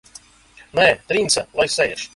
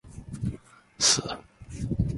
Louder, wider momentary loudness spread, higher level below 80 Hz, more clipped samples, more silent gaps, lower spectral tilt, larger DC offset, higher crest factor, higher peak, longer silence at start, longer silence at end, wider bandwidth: first, -18 LUFS vs -26 LUFS; second, 4 LU vs 22 LU; second, -52 dBFS vs -42 dBFS; neither; neither; about the same, -2 dB/octave vs -2.5 dB/octave; neither; about the same, 20 dB vs 20 dB; first, -2 dBFS vs -10 dBFS; first, 0.75 s vs 0.05 s; about the same, 0.1 s vs 0 s; about the same, 11.5 kHz vs 11.5 kHz